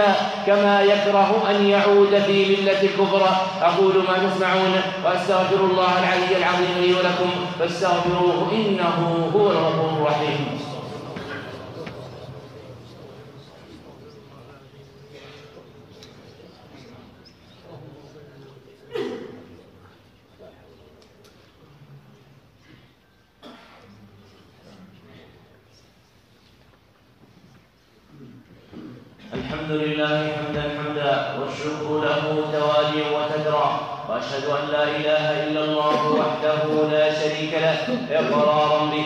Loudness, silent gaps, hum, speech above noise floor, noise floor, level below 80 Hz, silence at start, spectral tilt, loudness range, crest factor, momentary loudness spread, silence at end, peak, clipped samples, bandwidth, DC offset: -20 LUFS; none; none; 39 dB; -58 dBFS; -60 dBFS; 0 s; -5.5 dB/octave; 21 LU; 18 dB; 18 LU; 0 s; -4 dBFS; under 0.1%; 10 kHz; under 0.1%